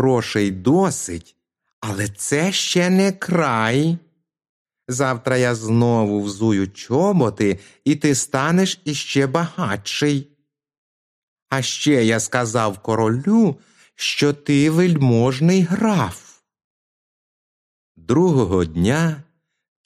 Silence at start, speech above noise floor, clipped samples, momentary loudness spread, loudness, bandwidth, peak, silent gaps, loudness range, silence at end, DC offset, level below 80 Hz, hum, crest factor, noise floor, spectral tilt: 0 s; over 72 dB; under 0.1%; 8 LU; -19 LUFS; 14.5 kHz; -2 dBFS; 1.73-1.82 s, 4.49-4.65 s, 10.78-11.36 s, 11.42-11.46 s, 16.64-17.95 s; 4 LU; 0.65 s; under 0.1%; -52 dBFS; none; 18 dB; under -90 dBFS; -5.5 dB/octave